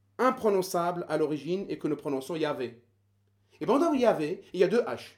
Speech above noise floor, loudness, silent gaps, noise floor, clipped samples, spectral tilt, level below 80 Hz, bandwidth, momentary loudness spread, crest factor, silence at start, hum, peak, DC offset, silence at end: 41 dB; -29 LUFS; none; -69 dBFS; under 0.1%; -5.5 dB/octave; -72 dBFS; 19.5 kHz; 8 LU; 18 dB; 0.2 s; none; -10 dBFS; under 0.1%; 0.1 s